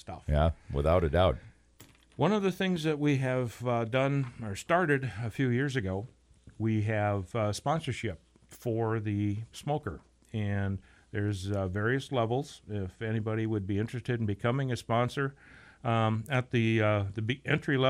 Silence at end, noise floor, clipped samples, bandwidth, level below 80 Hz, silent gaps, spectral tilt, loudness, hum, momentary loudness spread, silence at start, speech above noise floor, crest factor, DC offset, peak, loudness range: 0 s; -58 dBFS; under 0.1%; 15.5 kHz; -46 dBFS; none; -7 dB/octave; -31 LUFS; none; 10 LU; 0.05 s; 28 dB; 18 dB; under 0.1%; -12 dBFS; 4 LU